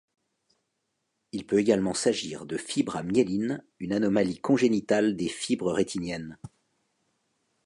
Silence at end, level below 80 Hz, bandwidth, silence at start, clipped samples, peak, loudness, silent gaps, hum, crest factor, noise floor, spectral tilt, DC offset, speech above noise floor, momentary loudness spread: 1.2 s; -62 dBFS; 11.5 kHz; 1.35 s; under 0.1%; -10 dBFS; -27 LUFS; none; none; 20 dB; -79 dBFS; -5 dB/octave; under 0.1%; 53 dB; 11 LU